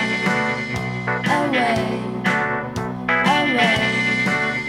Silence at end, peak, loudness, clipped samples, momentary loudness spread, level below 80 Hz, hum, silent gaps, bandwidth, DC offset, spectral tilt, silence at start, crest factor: 0 s; -4 dBFS; -19 LUFS; under 0.1%; 8 LU; -48 dBFS; none; none; 16 kHz; under 0.1%; -5 dB/octave; 0 s; 16 dB